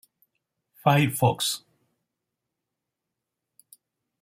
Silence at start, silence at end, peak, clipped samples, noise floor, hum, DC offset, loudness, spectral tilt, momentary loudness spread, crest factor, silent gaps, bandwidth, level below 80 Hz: 0.85 s; 2.65 s; -6 dBFS; under 0.1%; -85 dBFS; none; under 0.1%; -24 LUFS; -4.5 dB/octave; 7 LU; 22 dB; none; 16 kHz; -68 dBFS